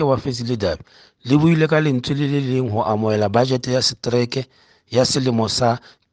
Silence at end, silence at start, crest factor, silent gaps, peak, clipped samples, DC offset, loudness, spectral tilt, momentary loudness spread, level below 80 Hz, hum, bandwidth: 0.35 s; 0 s; 16 dB; none; -2 dBFS; under 0.1%; under 0.1%; -19 LUFS; -5.5 dB/octave; 8 LU; -50 dBFS; none; 9.8 kHz